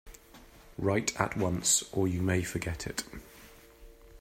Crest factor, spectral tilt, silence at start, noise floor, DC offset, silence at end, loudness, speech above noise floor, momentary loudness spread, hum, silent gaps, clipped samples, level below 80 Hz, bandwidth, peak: 24 dB; -4 dB/octave; 0.05 s; -55 dBFS; under 0.1%; 0 s; -30 LUFS; 24 dB; 20 LU; none; none; under 0.1%; -54 dBFS; 16 kHz; -8 dBFS